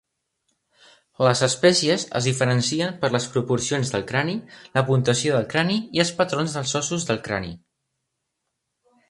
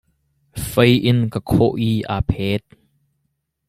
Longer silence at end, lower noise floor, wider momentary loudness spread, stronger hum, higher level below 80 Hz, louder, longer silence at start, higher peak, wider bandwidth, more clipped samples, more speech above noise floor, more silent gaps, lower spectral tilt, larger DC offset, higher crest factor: first, 1.55 s vs 1.1 s; first, -79 dBFS vs -72 dBFS; second, 7 LU vs 11 LU; neither; second, -56 dBFS vs -38 dBFS; second, -22 LUFS vs -18 LUFS; first, 1.2 s vs 0.55 s; about the same, -2 dBFS vs -2 dBFS; second, 11.5 kHz vs 15.5 kHz; neither; about the same, 57 dB vs 55 dB; neither; second, -4.5 dB/octave vs -6.5 dB/octave; neither; about the same, 22 dB vs 18 dB